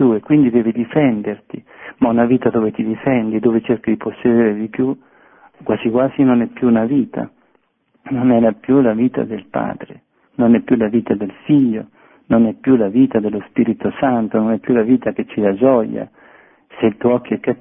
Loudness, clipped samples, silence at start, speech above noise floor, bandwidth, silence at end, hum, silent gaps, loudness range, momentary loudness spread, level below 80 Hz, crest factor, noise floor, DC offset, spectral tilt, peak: -16 LUFS; under 0.1%; 0 s; 45 dB; 3.6 kHz; 0.05 s; none; none; 2 LU; 11 LU; -52 dBFS; 16 dB; -60 dBFS; under 0.1%; -12.5 dB/octave; 0 dBFS